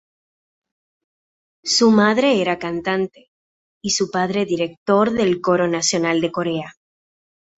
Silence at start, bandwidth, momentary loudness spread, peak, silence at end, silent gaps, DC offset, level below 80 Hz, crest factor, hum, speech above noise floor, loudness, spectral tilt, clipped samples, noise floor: 1.65 s; 8.2 kHz; 11 LU; -2 dBFS; 0.9 s; 3.28-3.81 s, 4.77-4.86 s; under 0.1%; -60 dBFS; 18 dB; none; over 72 dB; -19 LUFS; -4 dB/octave; under 0.1%; under -90 dBFS